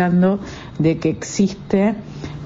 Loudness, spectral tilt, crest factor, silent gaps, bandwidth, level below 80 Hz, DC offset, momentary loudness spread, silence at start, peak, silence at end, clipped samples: -19 LUFS; -6.5 dB/octave; 16 dB; none; 7.8 kHz; -44 dBFS; under 0.1%; 12 LU; 0 s; -4 dBFS; 0 s; under 0.1%